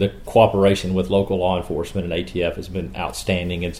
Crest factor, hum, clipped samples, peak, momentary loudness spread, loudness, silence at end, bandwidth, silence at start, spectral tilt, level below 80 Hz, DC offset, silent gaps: 20 dB; none; under 0.1%; -2 dBFS; 11 LU; -21 LUFS; 0 s; 15.5 kHz; 0 s; -6 dB/octave; -38 dBFS; 0.4%; none